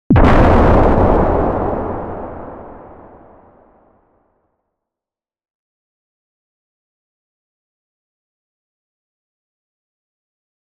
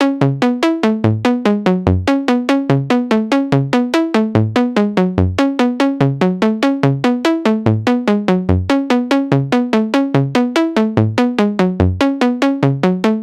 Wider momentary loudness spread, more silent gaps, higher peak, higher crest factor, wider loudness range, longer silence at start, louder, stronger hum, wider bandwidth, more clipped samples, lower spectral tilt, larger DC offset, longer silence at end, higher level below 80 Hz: first, 22 LU vs 0 LU; neither; about the same, 0 dBFS vs 0 dBFS; about the same, 18 dB vs 14 dB; first, 22 LU vs 0 LU; about the same, 0.1 s vs 0 s; about the same, -13 LUFS vs -15 LUFS; neither; second, 7 kHz vs 12 kHz; neither; first, -9 dB/octave vs -7 dB/octave; neither; first, 7.9 s vs 0 s; first, -24 dBFS vs -40 dBFS